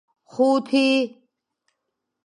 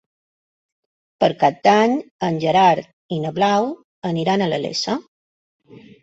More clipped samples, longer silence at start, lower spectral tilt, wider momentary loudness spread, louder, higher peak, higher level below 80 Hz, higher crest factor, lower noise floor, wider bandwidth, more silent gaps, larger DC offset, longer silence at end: neither; second, 0.35 s vs 1.2 s; second, -4 dB/octave vs -5.5 dB/octave; about the same, 12 LU vs 11 LU; about the same, -21 LUFS vs -19 LUFS; second, -8 dBFS vs -2 dBFS; second, -80 dBFS vs -62 dBFS; about the same, 16 dB vs 18 dB; second, -80 dBFS vs under -90 dBFS; first, 10.5 kHz vs 8 kHz; second, none vs 2.11-2.19 s, 2.93-3.09 s, 3.84-4.02 s, 5.08-5.60 s; neither; first, 1.15 s vs 0.25 s